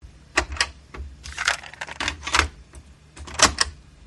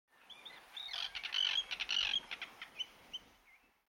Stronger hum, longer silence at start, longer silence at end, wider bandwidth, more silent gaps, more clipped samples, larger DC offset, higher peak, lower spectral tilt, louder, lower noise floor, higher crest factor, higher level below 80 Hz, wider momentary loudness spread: neither; second, 0.05 s vs 0.2 s; second, 0 s vs 0.6 s; second, 12 kHz vs 16.5 kHz; neither; neither; neither; first, 0 dBFS vs -22 dBFS; first, -1 dB/octave vs 1.5 dB/octave; first, -23 LUFS vs -37 LUFS; second, -47 dBFS vs -68 dBFS; first, 26 dB vs 20 dB; first, -38 dBFS vs -74 dBFS; about the same, 20 LU vs 19 LU